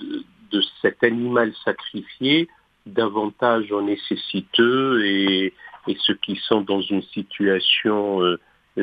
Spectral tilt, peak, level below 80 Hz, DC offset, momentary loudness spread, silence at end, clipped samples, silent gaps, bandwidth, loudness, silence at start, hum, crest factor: -7.5 dB/octave; -2 dBFS; -66 dBFS; under 0.1%; 12 LU; 0 s; under 0.1%; none; 5 kHz; -21 LUFS; 0 s; none; 20 dB